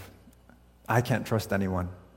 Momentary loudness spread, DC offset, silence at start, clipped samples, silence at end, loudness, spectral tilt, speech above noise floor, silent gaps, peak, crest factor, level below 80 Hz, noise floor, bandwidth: 7 LU; under 0.1%; 0 s; under 0.1%; 0.15 s; -29 LUFS; -6.5 dB/octave; 29 dB; none; -10 dBFS; 20 dB; -56 dBFS; -57 dBFS; 16.5 kHz